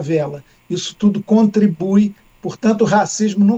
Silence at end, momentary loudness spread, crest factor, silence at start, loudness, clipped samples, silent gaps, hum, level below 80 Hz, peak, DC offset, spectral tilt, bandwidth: 0 s; 12 LU; 14 dB; 0 s; -16 LUFS; under 0.1%; none; none; -56 dBFS; -2 dBFS; under 0.1%; -6 dB/octave; 8.2 kHz